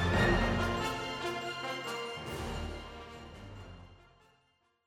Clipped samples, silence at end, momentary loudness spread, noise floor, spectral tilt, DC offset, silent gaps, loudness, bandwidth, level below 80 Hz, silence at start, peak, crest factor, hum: under 0.1%; 0.9 s; 21 LU; -73 dBFS; -5 dB/octave; under 0.1%; none; -34 LUFS; 16 kHz; -46 dBFS; 0 s; -18 dBFS; 18 dB; none